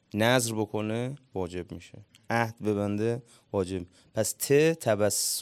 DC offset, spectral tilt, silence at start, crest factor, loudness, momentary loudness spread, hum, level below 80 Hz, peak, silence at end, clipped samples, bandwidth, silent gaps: under 0.1%; -4 dB/octave; 0.15 s; 22 dB; -28 LUFS; 13 LU; none; -68 dBFS; -8 dBFS; 0 s; under 0.1%; 18 kHz; none